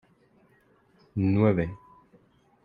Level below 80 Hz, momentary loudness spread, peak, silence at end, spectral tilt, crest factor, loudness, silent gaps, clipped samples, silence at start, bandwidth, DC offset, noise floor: -56 dBFS; 15 LU; -10 dBFS; 0.9 s; -11 dB/octave; 20 dB; -26 LUFS; none; under 0.1%; 1.15 s; 4.8 kHz; under 0.1%; -63 dBFS